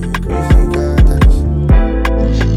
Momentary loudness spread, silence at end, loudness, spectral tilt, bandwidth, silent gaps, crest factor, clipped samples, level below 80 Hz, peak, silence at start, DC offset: 4 LU; 0 s; -13 LUFS; -7.5 dB/octave; 11.5 kHz; none; 8 dB; under 0.1%; -12 dBFS; -2 dBFS; 0 s; under 0.1%